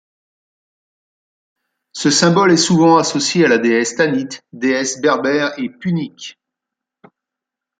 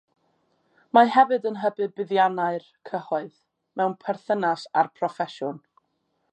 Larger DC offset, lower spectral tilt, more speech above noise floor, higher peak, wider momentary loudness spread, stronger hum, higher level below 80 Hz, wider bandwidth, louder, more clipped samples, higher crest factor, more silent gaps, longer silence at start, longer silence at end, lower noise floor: neither; second, -4 dB/octave vs -6 dB/octave; first, 69 dB vs 50 dB; about the same, -2 dBFS vs -4 dBFS; about the same, 14 LU vs 16 LU; neither; first, -62 dBFS vs -84 dBFS; about the same, 9.6 kHz vs 8.8 kHz; first, -15 LUFS vs -24 LUFS; neither; second, 16 dB vs 22 dB; neither; first, 1.95 s vs 0.95 s; first, 1.5 s vs 0.75 s; first, -84 dBFS vs -73 dBFS